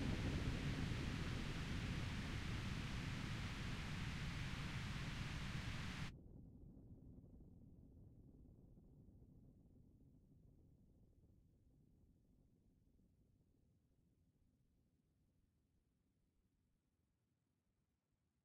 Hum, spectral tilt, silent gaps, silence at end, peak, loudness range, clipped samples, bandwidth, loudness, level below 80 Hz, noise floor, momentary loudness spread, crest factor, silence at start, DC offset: none; -5.5 dB/octave; none; 6.3 s; -30 dBFS; 21 LU; under 0.1%; 15.5 kHz; -47 LUFS; -56 dBFS; -88 dBFS; 22 LU; 20 dB; 0 s; under 0.1%